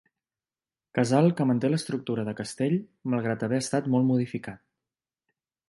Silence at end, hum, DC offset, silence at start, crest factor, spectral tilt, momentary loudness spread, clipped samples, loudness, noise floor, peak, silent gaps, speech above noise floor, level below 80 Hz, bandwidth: 1.1 s; none; under 0.1%; 0.95 s; 20 dB; -6.5 dB/octave; 11 LU; under 0.1%; -27 LUFS; under -90 dBFS; -8 dBFS; none; over 64 dB; -68 dBFS; 11.5 kHz